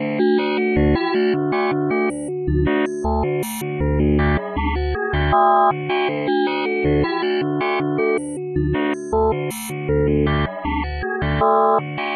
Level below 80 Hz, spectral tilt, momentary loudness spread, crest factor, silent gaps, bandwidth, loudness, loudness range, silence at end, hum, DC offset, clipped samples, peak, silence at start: -30 dBFS; -6.5 dB/octave; 7 LU; 14 dB; none; 13 kHz; -20 LUFS; 2 LU; 0 s; none; under 0.1%; under 0.1%; -6 dBFS; 0 s